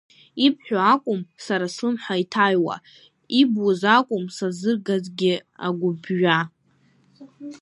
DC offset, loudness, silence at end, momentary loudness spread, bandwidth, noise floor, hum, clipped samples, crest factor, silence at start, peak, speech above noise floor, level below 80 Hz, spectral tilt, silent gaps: under 0.1%; -22 LUFS; 0.05 s; 10 LU; 11.5 kHz; -61 dBFS; none; under 0.1%; 20 dB; 0.35 s; -2 dBFS; 39 dB; -74 dBFS; -5.5 dB/octave; none